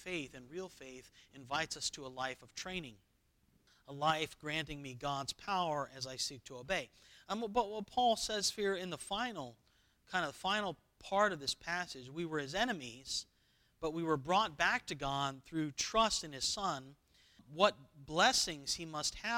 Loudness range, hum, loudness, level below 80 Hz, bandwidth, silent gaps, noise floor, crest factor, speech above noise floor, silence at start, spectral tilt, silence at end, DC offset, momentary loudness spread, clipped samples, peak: 6 LU; none; -37 LUFS; -64 dBFS; 17.5 kHz; none; -74 dBFS; 26 dB; 36 dB; 0 s; -2.5 dB/octave; 0 s; under 0.1%; 15 LU; under 0.1%; -14 dBFS